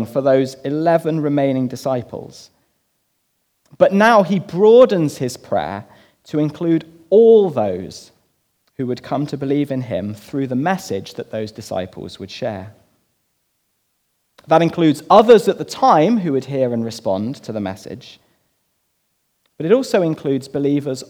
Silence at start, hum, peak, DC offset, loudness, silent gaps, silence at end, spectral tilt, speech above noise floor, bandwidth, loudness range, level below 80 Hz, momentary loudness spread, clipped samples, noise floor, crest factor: 0 s; none; 0 dBFS; under 0.1%; -17 LUFS; none; 0.05 s; -6.5 dB/octave; 51 dB; 15.5 kHz; 10 LU; -62 dBFS; 17 LU; under 0.1%; -68 dBFS; 18 dB